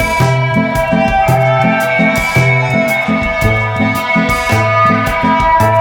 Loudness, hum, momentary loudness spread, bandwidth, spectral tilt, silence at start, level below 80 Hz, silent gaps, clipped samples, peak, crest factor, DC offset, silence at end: -11 LUFS; none; 3 LU; 20 kHz; -6 dB/octave; 0 s; -28 dBFS; none; under 0.1%; 0 dBFS; 10 dB; under 0.1%; 0 s